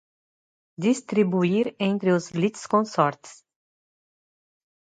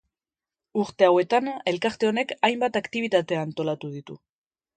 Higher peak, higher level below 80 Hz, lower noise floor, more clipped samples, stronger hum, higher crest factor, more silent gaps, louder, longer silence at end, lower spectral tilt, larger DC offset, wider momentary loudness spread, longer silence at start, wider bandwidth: about the same, -6 dBFS vs -4 dBFS; about the same, -70 dBFS vs -68 dBFS; about the same, under -90 dBFS vs under -90 dBFS; neither; neither; about the same, 20 dB vs 22 dB; neither; about the same, -24 LUFS vs -24 LUFS; first, 1.55 s vs 0.6 s; about the same, -6.5 dB/octave vs -5.5 dB/octave; neither; second, 5 LU vs 12 LU; about the same, 0.8 s vs 0.75 s; about the same, 9.4 kHz vs 9.2 kHz